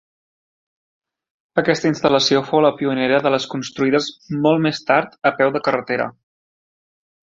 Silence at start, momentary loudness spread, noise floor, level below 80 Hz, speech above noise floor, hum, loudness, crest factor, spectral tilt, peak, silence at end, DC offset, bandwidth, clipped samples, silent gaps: 1.55 s; 7 LU; under -90 dBFS; -60 dBFS; over 72 dB; none; -18 LUFS; 18 dB; -5 dB/octave; -2 dBFS; 1.1 s; under 0.1%; 7.8 kHz; under 0.1%; none